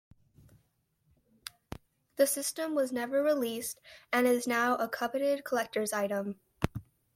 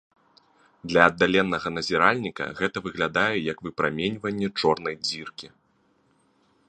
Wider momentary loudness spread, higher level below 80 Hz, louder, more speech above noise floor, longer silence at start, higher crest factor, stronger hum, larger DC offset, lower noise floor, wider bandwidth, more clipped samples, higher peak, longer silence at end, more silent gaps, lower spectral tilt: first, 19 LU vs 12 LU; about the same, -58 dBFS vs -58 dBFS; second, -31 LUFS vs -24 LUFS; about the same, 44 dB vs 41 dB; first, 2.2 s vs 0.85 s; about the same, 22 dB vs 26 dB; neither; neither; first, -74 dBFS vs -66 dBFS; first, 16.5 kHz vs 10 kHz; neither; second, -10 dBFS vs -2 dBFS; second, 0.35 s vs 1.2 s; neither; about the same, -4 dB/octave vs -5 dB/octave